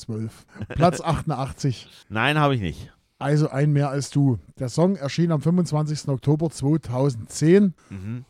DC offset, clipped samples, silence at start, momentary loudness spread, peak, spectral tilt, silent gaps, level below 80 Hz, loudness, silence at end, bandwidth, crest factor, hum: under 0.1%; under 0.1%; 0 s; 13 LU; -4 dBFS; -6.5 dB/octave; none; -48 dBFS; -23 LUFS; 0.05 s; 12 kHz; 20 dB; none